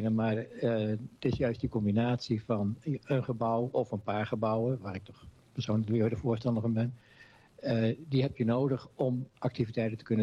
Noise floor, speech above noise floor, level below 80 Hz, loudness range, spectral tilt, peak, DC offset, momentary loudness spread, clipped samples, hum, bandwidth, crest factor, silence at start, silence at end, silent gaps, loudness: -58 dBFS; 27 dB; -58 dBFS; 1 LU; -8.5 dB/octave; -18 dBFS; under 0.1%; 6 LU; under 0.1%; none; 7.4 kHz; 14 dB; 0 s; 0 s; none; -32 LUFS